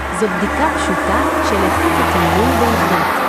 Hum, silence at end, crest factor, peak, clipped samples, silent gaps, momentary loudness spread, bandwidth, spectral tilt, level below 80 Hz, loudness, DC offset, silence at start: none; 0 s; 14 dB; -2 dBFS; under 0.1%; none; 3 LU; 15 kHz; -5 dB/octave; -30 dBFS; -15 LUFS; under 0.1%; 0 s